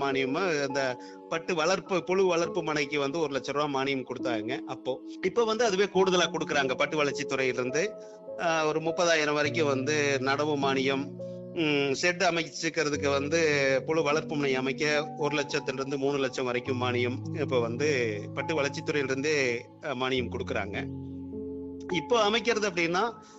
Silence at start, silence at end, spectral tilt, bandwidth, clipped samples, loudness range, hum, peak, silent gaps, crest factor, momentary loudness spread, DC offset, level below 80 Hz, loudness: 0 s; 0 s; -4.5 dB/octave; 8.2 kHz; under 0.1%; 3 LU; none; -12 dBFS; none; 16 dB; 9 LU; under 0.1%; -66 dBFS; -28 LUFS